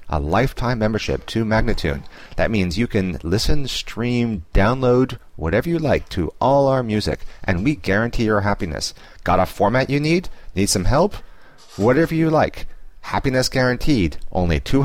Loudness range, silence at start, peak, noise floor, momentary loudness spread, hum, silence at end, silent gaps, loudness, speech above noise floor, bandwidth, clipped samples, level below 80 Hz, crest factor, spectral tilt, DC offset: 2 LU; 0.05 s; -6 dBFS; -44 dBFS; 9 LU; none; 0 s; none; -20 LUFS; 25 dB; 16 kHz; under 0.1%; -30 dBFS; 14 dB; -5.5 dB/octave; 0.8%